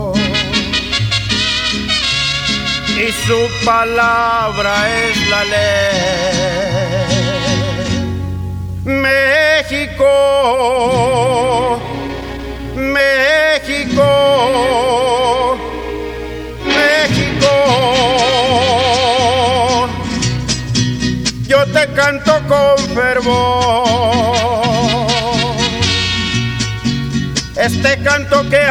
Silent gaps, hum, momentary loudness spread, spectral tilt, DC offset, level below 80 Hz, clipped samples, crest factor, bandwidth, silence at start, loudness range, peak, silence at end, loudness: none; none; 7 LU; -4 dB/octave; under 0.1%; -32 dBFS; under 0.1%; 14 dB; 16.5 kHz; 0 s; 2 LU; 0 dBFS; 0 s; -13 LUFS